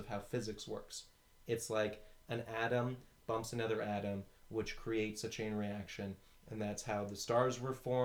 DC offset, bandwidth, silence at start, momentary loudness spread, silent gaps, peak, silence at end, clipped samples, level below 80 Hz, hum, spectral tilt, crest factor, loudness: under 0.1%; over 20 kHz; 0 s; 11 LU; none; -20 dBFS; 0 s; under 0.1%; -62 dBFS; none; -5 dB/octave; 20 dB; -40 LUFS